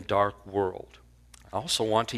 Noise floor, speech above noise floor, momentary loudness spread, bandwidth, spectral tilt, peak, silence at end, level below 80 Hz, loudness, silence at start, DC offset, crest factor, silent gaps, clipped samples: -54 dBFS; 26 dB; 16 LU; 15.5 kHz; -4 dB/octave; -10 dBFS; 0 s; -54 dBFS; -29 LUFS; 0 s; under 0.1%; 20 dB; none; under 0.1%